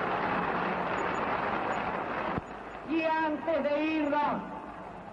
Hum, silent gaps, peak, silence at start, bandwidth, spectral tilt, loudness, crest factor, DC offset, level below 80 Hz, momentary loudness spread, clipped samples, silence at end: none; none; -18 dBFS; 0 s; 8 kHz; -6.5 dB/octave; -31 LUFS; 12 dB; under 0.1%; -58 dBFS; 12 LU; under 0.1%; 0 s